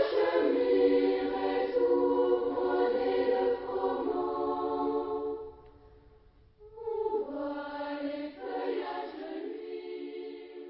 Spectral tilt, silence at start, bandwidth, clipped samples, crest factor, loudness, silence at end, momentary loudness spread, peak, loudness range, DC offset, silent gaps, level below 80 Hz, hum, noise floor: -8.5 dB/octave; 0 s; 5.8 kHz; under 0.1%; 18 dB; -31 LUFS; 0 s; 14 LU; -14 dBFS; 10 LU; under 0.1%; none; -62 dBFS; none; -59 dBFS